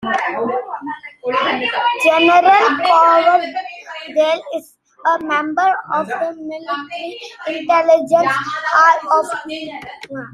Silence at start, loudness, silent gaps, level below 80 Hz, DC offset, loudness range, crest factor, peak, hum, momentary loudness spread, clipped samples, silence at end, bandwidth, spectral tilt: 0 s; -15 LUFS; none; -64 dBFS; under 0.1%; 6 LU; 16 dB; 0 dBFS; none; 17 LU; under 0.1%; 0.05 s; 13.5 kHz; -3.5 dB/octave